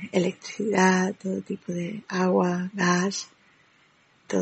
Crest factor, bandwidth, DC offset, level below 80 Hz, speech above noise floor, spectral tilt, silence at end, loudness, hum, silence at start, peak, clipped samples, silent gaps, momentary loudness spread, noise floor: 20 dB; 8.6 kHz; under 0.1%; -72 dBFS; 36 dB; -5 dB/octave; 0 s; -25 LUFS; none; 0 s; -6 dBFS; under 0.1%; none; 11 LU; -61 dBFS